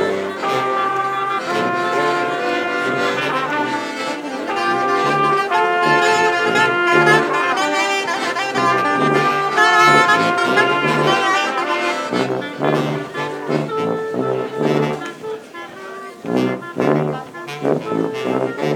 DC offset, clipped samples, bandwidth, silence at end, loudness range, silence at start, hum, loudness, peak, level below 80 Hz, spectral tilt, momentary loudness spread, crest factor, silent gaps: under 0.1%; under 0.1%; 18 kHz; 0 s; 8 LU; 0 s; none; -17 LUFS; 0 dBFS; -64 dBFS; -4.5 dB/octave; 10 LU; 18 dB; none